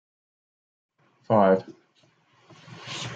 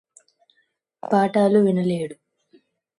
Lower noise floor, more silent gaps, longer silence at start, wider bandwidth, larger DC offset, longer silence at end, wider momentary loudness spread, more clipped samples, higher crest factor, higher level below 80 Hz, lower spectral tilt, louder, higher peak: second, -64 dBFS vs -69 dBFS; neither; first, 1.3 s vs 1.1 s; second, 9.2 kHz vs 11 kHz; neither; second, 0 s vs 0.85 s; first, 23 LU vs 15 LU; neither; about the same, 22 dB vs 18 dB; about the same, -72 dBFS vs -68 dBFS; second, -6 dB/octave vs -8 dB/octave; second, -23 LUFS vs -20 LUFS; about the same, -6 dBFS vs -6 dBFS